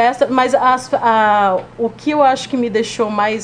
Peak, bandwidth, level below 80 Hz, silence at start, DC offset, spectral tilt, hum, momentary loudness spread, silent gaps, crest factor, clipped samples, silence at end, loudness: 0 dBFS; 10 kHz; -52 dBFS; 0 s; under 0.1%; -4.5 dB/octave; none; 6 LU; none; 14 dB; under 0.1%; 0 s; -15 LUFS